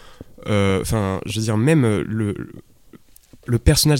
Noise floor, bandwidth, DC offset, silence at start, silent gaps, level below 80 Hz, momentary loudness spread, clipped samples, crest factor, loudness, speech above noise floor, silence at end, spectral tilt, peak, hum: -48 dBFS; 17 kHz; under 0.1%; 0.05 s; none; -32 dBFS; 16 LU; under 0.1%; 18 dB; -20 LUFS; 30 dB; 0 s; -5.5 dB/octave; -2 dBFS; none